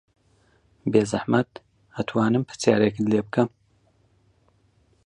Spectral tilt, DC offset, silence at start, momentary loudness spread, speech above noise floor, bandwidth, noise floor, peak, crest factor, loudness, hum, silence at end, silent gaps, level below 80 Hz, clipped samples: -6.5 dB/octave; under 0.1%; 0.85 s; 12 LU; 41 dB; 11 kHz; -63 dBFS; -4 dBFS; 22 dB; -23 LUFS; none; 1.6 s; none; -60 dBFS; under 0.1%